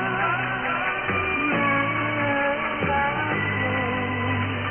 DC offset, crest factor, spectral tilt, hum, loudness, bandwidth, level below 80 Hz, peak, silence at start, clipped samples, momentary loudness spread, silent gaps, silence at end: under 0.1%; 12 dB; -1.5 dB/octave; none; -23 LUFS; 3.4 kHz; -48 dBFS; -12 dBFS; 0 s; under 0.1%; 3 LU; none; 0 s